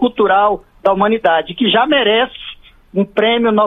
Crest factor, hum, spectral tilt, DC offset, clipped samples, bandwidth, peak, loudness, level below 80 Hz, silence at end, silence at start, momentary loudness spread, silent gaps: 14 dB; none; -7 dB/octave; under 0.1%; under 0.1%; 4 kHz; 0 dBFS; -14 LUFS; -46 dBFS; 0 s; 0 s; 9 LU; none